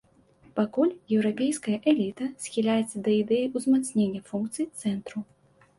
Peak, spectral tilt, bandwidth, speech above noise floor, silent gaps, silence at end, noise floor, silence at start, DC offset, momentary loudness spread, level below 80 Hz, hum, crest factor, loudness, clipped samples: -10 dBFS; -5.5 dB/octave; 11.5 kHz; 32 dB; none; 0.55 s; -58 dBFS; 0.55 s; under 0.1%; 9 LU; -68 dBFS; none; 18 dB; -27 LUFS; under 0.1%